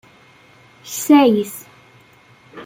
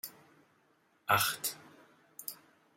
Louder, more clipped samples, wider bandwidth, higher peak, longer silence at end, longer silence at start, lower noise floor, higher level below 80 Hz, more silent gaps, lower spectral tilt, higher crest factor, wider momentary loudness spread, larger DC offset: first, -15 LUFS vs -33 LUFS; neither; about the same, 17 kHz vs 16.5 kHz; first, -2 dBFS vs -12 dBFS; second, 0 s vs 0.4 s; first, 0.85 s vs 0.05 s; second, -49 dBFS vs -71 dBFS; first, -66 dBFS vs -78 dBFS; neither; first, -4.5 dB/octave vs -1.5 dB/octave; second, 18 dB vs 26 dB; second, 18 LU vs 23 LU; neither